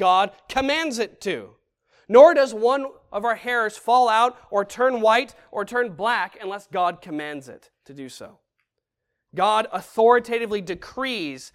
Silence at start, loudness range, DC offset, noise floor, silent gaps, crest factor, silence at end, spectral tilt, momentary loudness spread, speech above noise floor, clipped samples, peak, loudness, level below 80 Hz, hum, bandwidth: 0 s; 9 LU; under 0.1%; -81 dBFS; none; 22 dB; 0.05 s; -3.5 dB/octave; 15 LU; 60 dB; under 0.1%; 0 dBFS; -21 LUFS; -60 dBFS; none; 14.5 kHz